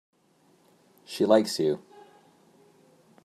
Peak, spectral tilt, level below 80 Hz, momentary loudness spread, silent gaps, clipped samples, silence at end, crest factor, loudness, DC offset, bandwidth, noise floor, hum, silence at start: -6 dBFS; -5 dB/octave; -80 dBFS; 14 LU; none; under 0.1%; 1.5 s; 24 dB; -25 LUFS; under 0.1%; 15.5 kHz; -64 dBFS; none; 1.1 s